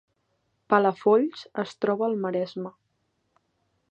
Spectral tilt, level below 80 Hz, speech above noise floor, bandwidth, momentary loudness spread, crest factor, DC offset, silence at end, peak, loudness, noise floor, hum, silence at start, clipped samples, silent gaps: -7 dB/octave; -78 dBFS; 49 dB; 8.2 kHz; 12 LU; 22 dB; under 0.1%; 1.2 s; -6 dBFS; -25 LUFS; -74 dBFS; none; 0.7 s; under 0.1%; none